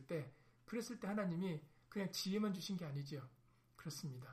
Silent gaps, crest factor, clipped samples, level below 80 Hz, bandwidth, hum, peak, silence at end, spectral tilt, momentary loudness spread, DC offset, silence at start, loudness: none; 16 dB; under 0.1%; -78 dBFS; 15.5 kHz; none; -30 dBFS; 0 s; -5.5 dB/octave; 11 LU; under 0.1%; 0 s; -45 LUFS